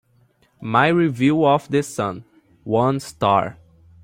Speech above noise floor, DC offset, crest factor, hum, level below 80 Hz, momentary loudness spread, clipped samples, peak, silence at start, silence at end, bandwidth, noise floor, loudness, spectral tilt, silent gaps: 41 dB; under 0.1%; 18 dB; none; -58 dBFS; 15 LU; under 0.1%; -2 dBFS; 0.6 s; 0.5 s; 16 kHz; -59 dBFS; -19 LUFS; -6.5 dB/octave; none